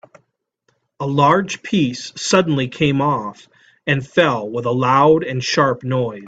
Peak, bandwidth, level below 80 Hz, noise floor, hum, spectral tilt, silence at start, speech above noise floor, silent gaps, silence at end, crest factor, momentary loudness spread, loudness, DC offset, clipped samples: 0 dBFS; 9 kHz; -54 dBFS; -67 dBFS; none; -5.5 dB/octave; 1 s; 50 dB; none; 0 s; 18 dB; 8 LU; -17 LUFS; under 0.1%; under 0.1%